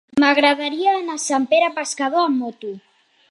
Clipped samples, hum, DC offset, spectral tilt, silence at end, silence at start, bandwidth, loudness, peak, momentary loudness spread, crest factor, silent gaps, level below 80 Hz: under 0.1%; none; under 0.1%; -2 dB/octave; 0.5 s; 0.15 s; 11.5 kHz; -18 LUFS; -2 dBFS; 16 LU; 18 dB; none; -68 dBFS